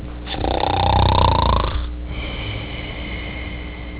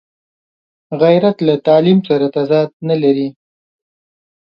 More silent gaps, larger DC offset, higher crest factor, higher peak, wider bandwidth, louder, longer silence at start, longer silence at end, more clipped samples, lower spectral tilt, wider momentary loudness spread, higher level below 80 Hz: second, none vs 2.73-2.80 s; neither; about the same, 18 dB vs 14 dB; about the same, -2 dBFS vs 0 dBFS; second, 4 kHz vs 6 kHz; second, -21 LUFS vs -13 LUFS; second, 0 s vs 0.9 s; second, 0 s vs 1.3 s; neither; about the same, -10 dB/octave vs -9.5 dB/octave; first, 13 LU vs 7 LU; first, -26 dBFS vs -62 dBFS